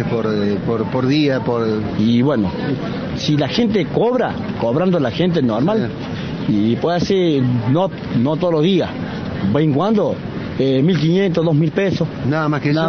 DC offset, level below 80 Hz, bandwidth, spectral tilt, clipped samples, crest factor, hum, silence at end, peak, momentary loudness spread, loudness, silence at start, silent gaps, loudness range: under 0.1%; -44 dBFS; 6.8 kHz; -7.5 dB/octave; under 0.1%; 14 dB; none; 0 s; -2 dBFS; 6 LU; -17 LUFS; 0 s; none; 1 LU